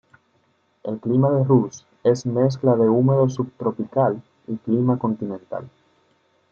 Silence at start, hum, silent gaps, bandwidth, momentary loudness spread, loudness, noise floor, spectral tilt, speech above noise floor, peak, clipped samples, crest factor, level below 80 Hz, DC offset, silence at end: 0.85 s; none; none; 7.4 kHz; 15 LU; -21 LUFS; -64 dBFS; -9 dB/octave; 44 dB; -4 dBFS; under 0.1%; 18 dB; -66 dBFS; under 0.1%; 0.85 s